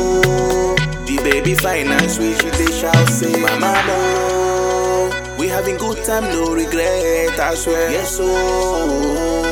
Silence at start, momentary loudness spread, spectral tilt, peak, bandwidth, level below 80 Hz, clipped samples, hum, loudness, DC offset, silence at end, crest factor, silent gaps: 0 s; 4 LU; -4.5 dB/octave; 0 dBFS; 19 kHz; -30 dBFS; under 0.1%; none; -16 LUFS; under 0.1%; 0 s; 16 dB; none